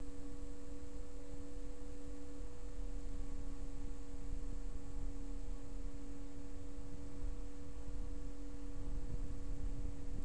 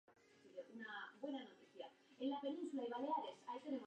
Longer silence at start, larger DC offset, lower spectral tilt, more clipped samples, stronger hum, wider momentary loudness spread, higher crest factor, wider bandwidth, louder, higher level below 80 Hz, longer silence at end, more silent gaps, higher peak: about the same, 0 s vs 0.1 s; first, 1% vs under 0.1%; first, -6.5 dB/octave vs -4.5 dB/octave; neither; neither; second, 5 LU vs 14 LU; about the same, 16 dB vs 16 dB; first, 10.5 kHz vs 9 kHz; second, -51 LUFS vs -48 LUFS; first, -44 dBFS vs under -90 dBFS; about the same, 0 s vs 0 s; neither; first, -28 dBFS vs -32 dBFS